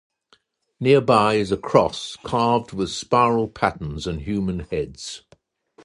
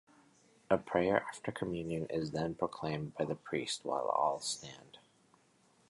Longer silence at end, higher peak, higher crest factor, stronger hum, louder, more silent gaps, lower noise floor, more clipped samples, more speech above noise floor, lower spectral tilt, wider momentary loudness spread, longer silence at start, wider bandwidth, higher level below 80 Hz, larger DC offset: second, 0.65 s vs 0.9 s; first, -2 dBFS vs -14 dBFS; about the same, 20 dB vs 24 dB; neither; first, -21 LUFS vs -36 LUFS; neither; second, -62 dBFS vs -69 dBFS; neither; first, 41 dB vs 34 dB; about the same, -5.5 dB/octave vs -4.5 dB/octave; first, 13 LU vs 8 LU; about the same, 0.8 s vs 0.7 s; about the same, 11.5 kHz vs 11.5 kHz; first, -44 dBFS vs -66 dBFS; neither